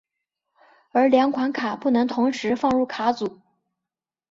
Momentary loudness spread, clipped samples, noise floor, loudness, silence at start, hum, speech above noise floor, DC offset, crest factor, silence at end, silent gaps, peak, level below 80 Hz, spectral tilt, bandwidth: 7 LU; under 0.1%; -88 dBFS; -22 LUFS; 0.95 s; none; 67 dB; under 0.1%; 18 dB; 1 s; none; -6 dBFS; -62 dBFS; -5.5 dB/octave; 7.6 kHz